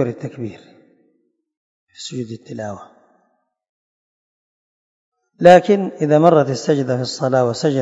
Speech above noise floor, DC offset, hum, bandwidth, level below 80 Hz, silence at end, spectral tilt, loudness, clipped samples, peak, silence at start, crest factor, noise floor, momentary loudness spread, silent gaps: 50 dB; under 0.1%; none; 8.6 kHz; -64 dBFS; 0 s; -6 dB/octave; -15 LUFS; 0.2%; 0 dBFS; 0 s; 18 dB; -66 dBFS; 20 LU; 1.57-1.87 s, 3.69-5.12 s